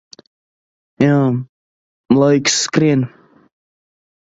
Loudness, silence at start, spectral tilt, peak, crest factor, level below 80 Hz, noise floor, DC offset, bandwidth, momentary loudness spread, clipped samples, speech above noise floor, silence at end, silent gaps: -15 LUFS; 1 s; -5 dB/octave; 0 dBFS; 18 dB; -58 dBFS; under -90 dBFS; under 0.1%; 8 kHz; 11 LU; under 0.1%; over 76 dB; 1.15 s; 1.49-2.04 s